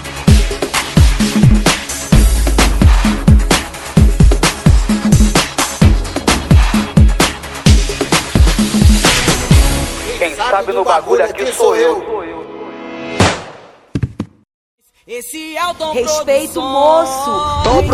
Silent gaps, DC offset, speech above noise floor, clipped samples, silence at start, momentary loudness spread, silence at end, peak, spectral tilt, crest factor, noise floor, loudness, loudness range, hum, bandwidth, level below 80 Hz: 14.54-14.78 s; under 0.1%; 23 dB; 0.3%; 0 s; 13 LU; 0 s; 0 dBFS; -5 dB/octave; 12 dB; -36 dBFS; -13 LUFS; 8 LU; none; 14.5 kHz; -16 dBFS